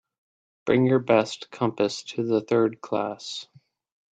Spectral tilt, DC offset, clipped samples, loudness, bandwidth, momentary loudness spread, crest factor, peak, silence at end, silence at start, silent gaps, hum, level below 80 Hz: -6 dB/octave; under 0.1%; under 0.1%; -25 LUFS; 9.2 kHz; 13 LU; 20 dB; -6 dBFS; 0.7 s; 0.65 s; none; none; -66 dBFS